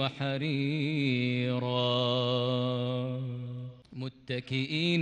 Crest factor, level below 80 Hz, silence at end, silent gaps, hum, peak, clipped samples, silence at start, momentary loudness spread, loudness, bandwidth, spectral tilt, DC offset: 16 dB; -70 dBFS; 0 s; none; none; -14 dBFS; under 0.1%; 0 s; 13 LU; -30 LUFS; 9 kHz; -7 dB/octave; under 0.1%